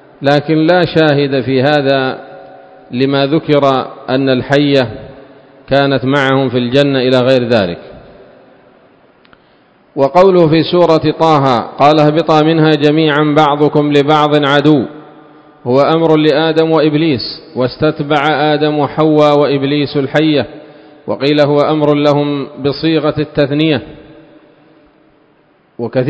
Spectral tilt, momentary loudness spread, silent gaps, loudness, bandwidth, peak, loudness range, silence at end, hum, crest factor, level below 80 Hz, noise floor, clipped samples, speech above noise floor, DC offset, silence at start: -7.5 dB/octave; 8 LU; none; -11 LUFS; 8 kHz; 0 dBFS; 5 LU; 0 s; none; 12 dB; -48 dBFS; -51 dBFS; 0.4%; 40 dB; under 0.1%; 0.2 s